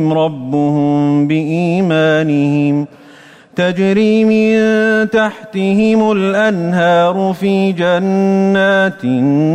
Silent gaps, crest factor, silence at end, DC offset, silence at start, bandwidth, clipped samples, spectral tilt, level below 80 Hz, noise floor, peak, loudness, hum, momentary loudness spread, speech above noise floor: none; 10 dB; 0 s; under 0.1%; 0 s; 9.8 kHz; under 0.1%; -7 dB/octave; -54 dBFS; -40 dBFS; -4 dBFS; -13 LUFS; none; 5 LU; 28 dB